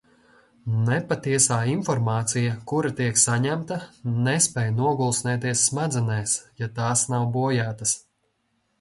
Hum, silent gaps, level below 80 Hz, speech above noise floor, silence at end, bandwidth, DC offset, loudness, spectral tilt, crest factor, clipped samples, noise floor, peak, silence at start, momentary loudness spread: none; none; -58 dBFS; 48 dB; 0.8 s; 11.5 kHz; under 0.1%; -23 LUFS; -4 dB/octave; 18 dB; under 0.1%; -71 dBFS; -6 dBFS; 0.65 s; 8 LU